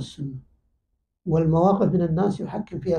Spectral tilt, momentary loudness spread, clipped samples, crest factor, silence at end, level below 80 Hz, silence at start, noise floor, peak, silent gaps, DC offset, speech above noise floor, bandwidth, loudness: -9 dB/octave; 16 LU; under 0.1%; 16 dB; 0 s; -50 dBFS; 0 s; -74 dBFS; -8 dBFS; none; under 0.1%; 52 dB; 9.4 kHz; -22 LUFS